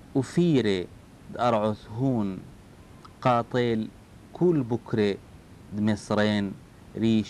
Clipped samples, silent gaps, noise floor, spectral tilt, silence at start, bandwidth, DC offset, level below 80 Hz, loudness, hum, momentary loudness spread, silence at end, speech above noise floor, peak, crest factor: under 0.1%; none; -49 dBFS; -7 dB/octave; 0.05 s; 11.5 kHz; under 0.1%; -56 dBFS; -26 LUFS; none; 15 LU; 0 s; 24 dB; -8 dBFS; 18 dB